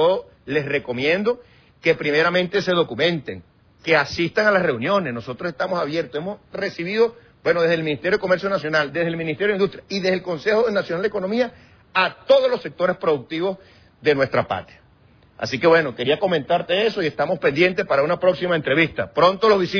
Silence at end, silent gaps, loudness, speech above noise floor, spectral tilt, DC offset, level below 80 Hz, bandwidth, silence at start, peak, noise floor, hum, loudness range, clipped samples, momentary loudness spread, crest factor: 0 s; none; -21 LUFS; 33 dB; -6 dB/octave; under 0.1%; -56 dBFS; 5.4 kHz; 0 s; -4 dBFS; -53 dBFS; none; 3 LU; under 0.1%; 9 LU; 18 dB